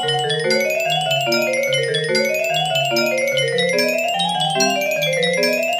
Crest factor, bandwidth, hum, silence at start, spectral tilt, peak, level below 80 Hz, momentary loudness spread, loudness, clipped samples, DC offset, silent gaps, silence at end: 16 dB; 15.5 kHz; none; 0 s; -3 dB/octave; -4 dBFS; -66 dBFS; 1 LU; -17 LUFS; under 0.1%; under 0.1%; none; 0 s